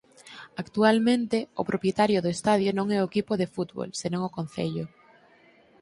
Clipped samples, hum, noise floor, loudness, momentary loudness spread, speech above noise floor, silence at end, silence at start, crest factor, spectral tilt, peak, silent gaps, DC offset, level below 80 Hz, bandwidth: under 0.1%; none; -58 dBFS; -26 LUFS; 14 LU; 32 dB; 0.95 s; 0.25 s; 20 dB; -5.5 dB/octave; -6 dBFS; none; under 0.1%; -64 dBFS; 11.5 kHz